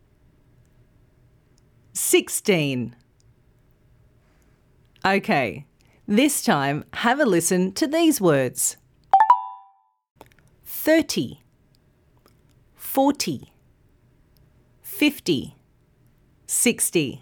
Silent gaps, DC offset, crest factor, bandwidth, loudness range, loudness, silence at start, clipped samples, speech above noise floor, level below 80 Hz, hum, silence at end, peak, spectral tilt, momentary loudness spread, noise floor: 10.11-10.15 s; under 0.1%; 22 dB; over 20 kHz; 8 LU; -21 LUFS; 1.95 s; under 0.1%; 39 dB; -62 dBFS; none; 0.05 s; -4 dBFS; -3.5 dB/octave; 16 LU; -60 dBFS